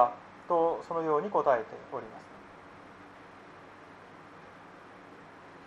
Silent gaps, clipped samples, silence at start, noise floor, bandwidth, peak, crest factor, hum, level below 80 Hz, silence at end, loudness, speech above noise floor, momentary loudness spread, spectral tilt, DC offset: none; under 0.1%; 0 s; -51 dBFS; 8.6 kHz; -10 dBFS; 24 dB; none; -72 dBFS; 0 s; -30 LUFS; 20 dB; 23 LU; -7 dB/octave; under 0.1%